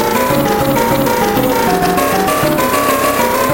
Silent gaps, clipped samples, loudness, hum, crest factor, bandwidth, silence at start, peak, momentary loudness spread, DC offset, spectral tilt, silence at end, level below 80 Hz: none; under 0.1%; -13 LUFS; none; 12 dB; 17.5 kHz; 0 s; 0 dBFS; 0 LU; under 0.1%; -4.5 dB/octave; 0 s; -36 dBFS